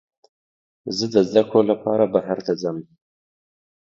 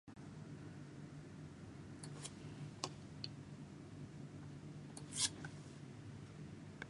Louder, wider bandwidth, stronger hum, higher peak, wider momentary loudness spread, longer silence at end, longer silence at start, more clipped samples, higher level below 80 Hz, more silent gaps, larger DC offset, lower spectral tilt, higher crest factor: first, -20 LUFS vs -49 LUFS; second, 7.6 kHz vs 11.5 kHz; neither; first, 0 dBFS vs -18 dBFS; about the same, 11 LU vs 13 LU; first, 1.1 s vs 0 s; first, 0.85 s vs 0.05 s; neither; first, -64 dBFS vs -70 dBFS; neither; neither; first, -6 dB/octave vs -3 dB/octave; second, 22 dB vs 32 dB